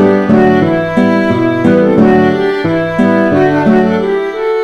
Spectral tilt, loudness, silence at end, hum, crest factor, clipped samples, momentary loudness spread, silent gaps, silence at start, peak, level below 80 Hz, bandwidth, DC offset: -8 dB/octave; -10 LUFS; 0 s; none; 10 dB; 0.4%; 5 LU; none; 0 s; 0 dBFS; -40 dBFS; 8.6 kHz; under 0.1%